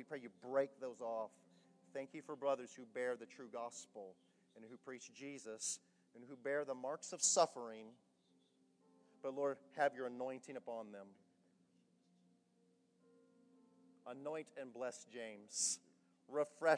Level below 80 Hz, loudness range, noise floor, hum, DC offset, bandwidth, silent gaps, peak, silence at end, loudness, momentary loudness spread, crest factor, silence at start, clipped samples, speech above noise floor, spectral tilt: under -90 dBFS; 13 LU; -77 dBFS; none; under 0.1%; 11 kHz; none; -20 dBFS; 0 s; -43 LUFS; 17 LU; 24 dB; 0 s; under 0.1%; 33 dB; -2 dB/octave